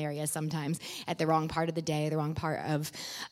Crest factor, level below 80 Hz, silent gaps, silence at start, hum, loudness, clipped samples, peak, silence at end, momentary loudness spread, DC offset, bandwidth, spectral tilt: 18 dB; -62 dBFS; none; 0 s; none; -33 LUFS; under 0.1%; -16 dBFS; 0.05 s; 8 LU; under 0.1%; 16 kHz; -5 dB/octave